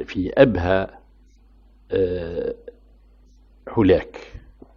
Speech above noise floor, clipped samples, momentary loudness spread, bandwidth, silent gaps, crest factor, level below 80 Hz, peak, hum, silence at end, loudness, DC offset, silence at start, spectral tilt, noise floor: 32 dB; under 0.1%; 22 LU; 6.8 kHz; none; 22 dB; -42 dBFS; 0 dBFS; none; 0.4 s; -21 LUFS; under 0.1%; 0 s; -8.5 dB/octave; -52 dBFS